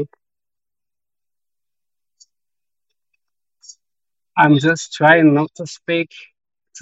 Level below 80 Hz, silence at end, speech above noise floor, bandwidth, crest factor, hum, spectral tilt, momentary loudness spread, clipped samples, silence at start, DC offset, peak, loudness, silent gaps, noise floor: -68 dBFS; 0 s; over 75 dB; 8 kHz; 20 dB; none; -5.5 dB/octave; 17 LU; under 0.1%; 0 s; under 0.1%; 0 dBFS; -15 LUFS; none; under -90 dBFS